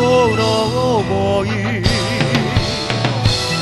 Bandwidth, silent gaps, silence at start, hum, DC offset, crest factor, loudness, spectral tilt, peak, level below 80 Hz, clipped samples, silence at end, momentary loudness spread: 12.5 kHz; none; 0 s; none; under 0.1%; 16 dB; -16 LUFS; -5 dB/octave; 0 dBFS; -32 dBFS; under 0.1%; 0 s; 4 LU